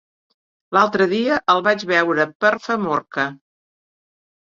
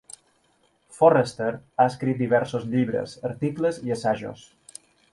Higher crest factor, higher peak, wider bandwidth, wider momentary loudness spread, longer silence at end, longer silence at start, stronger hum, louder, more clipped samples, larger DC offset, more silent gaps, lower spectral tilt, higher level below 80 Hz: about the same, 20 dB vs 20 dB; about the same, -2 dBFS vs -4 dBFS; second, 7.6 kHz vs 11.5 kHz; second, 6 LU vs 15 LU; first, 1.05 s vs 0.8 s; second, 0.7 s vs 0.9 s; neither; first, -18 LUFS vs -24 LUFS; neither; neither; first, 2.35-2.40 s vs none; second, -5 dB/octave vs -6.5 dB/octave; about the same, -64 dBFS vs -62 dBFS